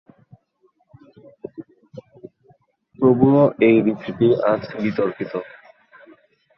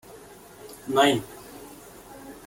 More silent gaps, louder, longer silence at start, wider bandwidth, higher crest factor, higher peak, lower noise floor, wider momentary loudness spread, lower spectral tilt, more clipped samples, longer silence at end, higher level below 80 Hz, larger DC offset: neither; first, -18 LUFS vs -23 LUFS; first, 1.6 s vs 0.15 s; second, 5.8 kHz vs 17 kHz; about the same, 20 dB vs 22 dB; first, -2 dBFS vs -6 dBFS; first, -63 dBFS vs -47 dBFS; about the same, 25 LU vs 25 LU; first, -10 dB/octave vs -4 dB/octave; neither; first, 1.15 s vs 0.15 s; about the same, -58 dBFS vs -60 dBFS; neither